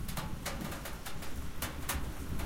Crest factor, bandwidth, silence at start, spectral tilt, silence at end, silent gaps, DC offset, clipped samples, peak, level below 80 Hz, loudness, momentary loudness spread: 16 dB; 17 kHz; 0 s; -4 dB/octave; 0 s; none; under 0.1%; under 0.1%; -20 dBFS; -44 dBFS; -40 LUFS; 6 LU